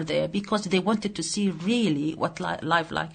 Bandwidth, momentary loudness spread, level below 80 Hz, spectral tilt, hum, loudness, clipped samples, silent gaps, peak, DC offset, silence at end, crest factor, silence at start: 9.6 kHz; 4 LU; -58 dBFS; -4.5 dB/octave; none; -26 LUFS; under 0.1%; none; -8 dBFS; under 0.1%; 0 s; 18 dB; 0 s